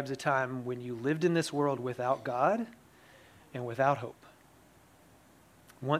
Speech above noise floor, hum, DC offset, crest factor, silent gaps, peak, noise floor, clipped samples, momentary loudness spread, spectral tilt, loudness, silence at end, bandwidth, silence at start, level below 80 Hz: 29 dB; none; under 0.1%; 20 dB; none; -12 dBFS; -60 dBFS; under 0.1%; 12 LU; -6 dB/octave; -32 LUFS; 0 s; 16 kHz; 0 s; -74 dBFS